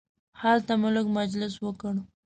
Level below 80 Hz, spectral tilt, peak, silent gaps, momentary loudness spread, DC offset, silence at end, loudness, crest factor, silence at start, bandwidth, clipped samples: -62 dBFS; -6 dB/octave; -12 dBFS; none; 9 LU; under 0.1%; 0.2 s; -27 LUFS; 16 dB; 0.35 s; 9 kHz; under 0.1%